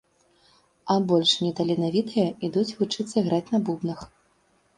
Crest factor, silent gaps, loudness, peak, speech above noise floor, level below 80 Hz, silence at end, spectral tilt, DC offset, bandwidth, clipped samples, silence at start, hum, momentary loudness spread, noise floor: 18 dB; none; -24 LUFS; -8 dBFS; 41 dB; -62 dBFS; 0.7 s; -6 dB/octave; under 0.1%; 11 kHz; under 0.1%; 0.85 s; none; 10 LU; -65 dBFS